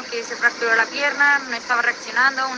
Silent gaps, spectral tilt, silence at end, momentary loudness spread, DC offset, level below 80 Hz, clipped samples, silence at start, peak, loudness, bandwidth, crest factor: none; -0.5 dB/octave; 0 s; 4 LU; under 0.1%; -72 dBFS; under 0.1%; 0 s; -4 dBFS; -19 LUFS; 9.8 kHz; 16 dB